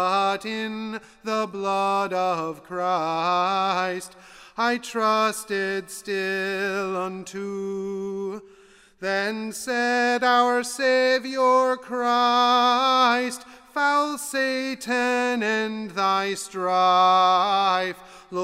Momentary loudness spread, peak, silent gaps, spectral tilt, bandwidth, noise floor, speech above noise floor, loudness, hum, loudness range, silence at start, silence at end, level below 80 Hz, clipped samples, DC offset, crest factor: 12 LU; -8 dBFS; none; -3 dB/octave; 16 kHz; -53 dBFS; 30 dB; -23 LUFS; none; 8 LU; 0 s; 0 s; -66 dBFS; under 0.1%; under 0.1%; 16 dB